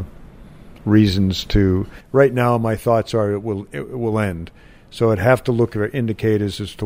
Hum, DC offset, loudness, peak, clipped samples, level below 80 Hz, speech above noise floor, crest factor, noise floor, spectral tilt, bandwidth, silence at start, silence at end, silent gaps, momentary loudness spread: none; under 0.1%; -19 LUFS; -2 dBFS; under 0.1%; -36 dBFS; 22 dB; 18 dB; -40 dBFS; -7 dB/octave; 16 kHz; 0 s; 0 s; none; 12 LU